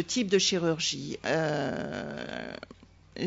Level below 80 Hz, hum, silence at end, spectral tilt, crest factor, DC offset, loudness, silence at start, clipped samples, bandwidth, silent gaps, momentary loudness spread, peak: -62 dBFS; none; 0 s; -3.5 dB/octave; 20 dB; under 0.1%; -29 LUFS; 0 s; under 0.1%; 8 kHz; none; 18 LU; -12 dBFS